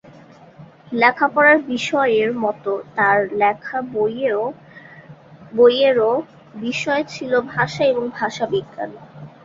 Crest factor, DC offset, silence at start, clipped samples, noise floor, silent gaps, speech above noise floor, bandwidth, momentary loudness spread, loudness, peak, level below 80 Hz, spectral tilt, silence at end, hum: 18 dB; under 0.1%; 0.6 s; under 0.1%; -45 dBFS; none; 26 dB; 7.8 kHz; 14 LU; -18 LUFS; -2 dBFS; -62 dBFS; -5 dB/octave; 0.15 s; none